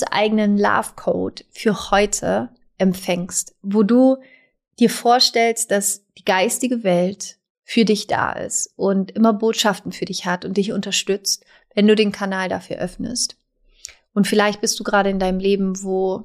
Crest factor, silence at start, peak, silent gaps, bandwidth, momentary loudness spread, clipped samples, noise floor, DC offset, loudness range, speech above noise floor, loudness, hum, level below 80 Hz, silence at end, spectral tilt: 16 dB; 0 s; -2 dBFS; 7.50-7.55 s; 15.5 kHz; 10 LU; under 0.1%; -43 dBFS; under 0.1%; 3 LU; 24 dB; -19 LUFS; none; -48 dBFS; 0 s; -4 dB/octave